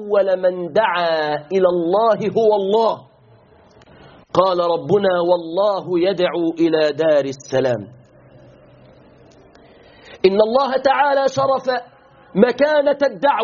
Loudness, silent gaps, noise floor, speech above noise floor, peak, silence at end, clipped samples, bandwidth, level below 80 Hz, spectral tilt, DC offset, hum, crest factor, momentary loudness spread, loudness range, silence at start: -17 LUFS; none; -49 dBFS; 33 dB; 0 dBFS; 0 s; under 0.1%; 7.2 kHz; -60 dBFS; -4 dB/octave; under 0.1%; none; 18 dB; 5 LU; 5 LU; 0 s